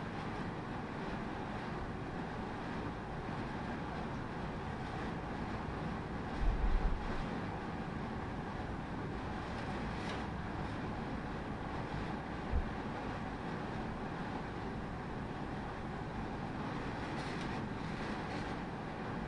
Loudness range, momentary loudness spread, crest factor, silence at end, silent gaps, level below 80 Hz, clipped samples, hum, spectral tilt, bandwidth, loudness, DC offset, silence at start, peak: 2 LU; 3 LU; 20 dB; 0 s; none; -46 dBFS; under 0.1%; none; -7 dB/octave; 11 kHz; -41 LUFS; under 0.1%; 0 s; -20 dBFS